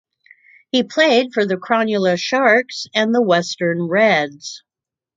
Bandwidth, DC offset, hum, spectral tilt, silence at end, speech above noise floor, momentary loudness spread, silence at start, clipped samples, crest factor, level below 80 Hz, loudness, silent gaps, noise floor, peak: 8.6 kHz; under 0.1%; none; -4.5 dB/octave; 0.6 s; 34 dB; 7 LU; 0.75 s; under 0.1%; 18 dB; -68 dBFS; -17 LUFS; none; -50 dBFS; 0 dBFS